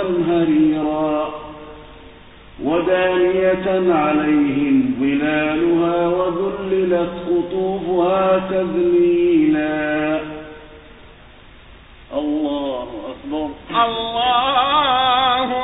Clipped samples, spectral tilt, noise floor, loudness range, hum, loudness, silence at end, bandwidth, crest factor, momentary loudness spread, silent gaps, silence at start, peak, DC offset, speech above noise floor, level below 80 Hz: under 0.1%; -10.5 dB/octave; -43 dBFS; 7 LU; none; -18 LUFS; 0 s; 4 kHz; 16 dB; 12 LU; none; 0 s; -4 dBFS; under 0.1%; 26 dB; -46 dBFS